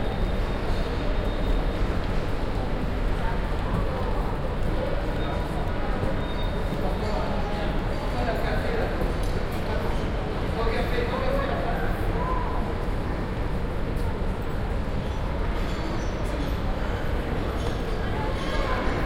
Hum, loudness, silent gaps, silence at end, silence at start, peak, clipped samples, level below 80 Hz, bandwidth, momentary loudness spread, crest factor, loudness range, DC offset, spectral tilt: none; -29 LUFS; none; 0 s; 0 s; -10 dBFS; under 0.1%; -28 dBFS; 15 kHz; 3 LU; 14 dB; 2 LU; under 0.1%; -7 dB/octave